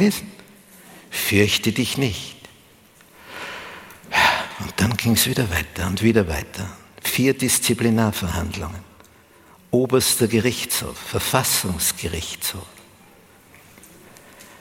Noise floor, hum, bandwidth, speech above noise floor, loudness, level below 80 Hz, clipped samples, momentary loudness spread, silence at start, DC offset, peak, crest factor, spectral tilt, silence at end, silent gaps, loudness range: -51 dBFS; none; 17 kHz; 30 dB; -20 LUFS; -44 dBFS; under 0.1%; 16 LU; 0 s; under 0.1%; -2 dBFS; 22 dB; -3.5 dB/octave; 0.05 s; none; 3 LU